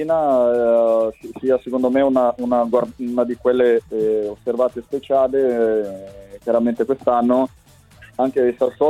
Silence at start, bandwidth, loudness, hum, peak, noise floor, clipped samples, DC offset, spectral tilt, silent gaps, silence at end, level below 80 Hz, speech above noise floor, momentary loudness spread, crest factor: 0 s; 13 kHz; -19 LUFS; none; -4 dBFS; -46 dBFS; under 0.1%; under 0.1%; -7 dB/octave; none; 0 s; -54 dBFS; 29 dB; 9 LU; 14 dB